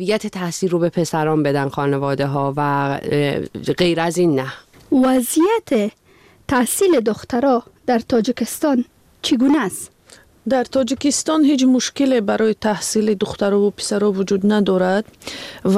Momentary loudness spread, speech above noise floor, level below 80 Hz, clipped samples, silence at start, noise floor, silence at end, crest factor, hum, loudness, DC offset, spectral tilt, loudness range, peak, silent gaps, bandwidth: 9 LU; 31 dB; -52 dBFS; under 0.1%; 0 s; -48 dBFS; 0 s; 14 dB; none; -18 LUFS; under 0.1%; -5 dB/octave; 2 LU; -4 dBFS; none; 16 kHz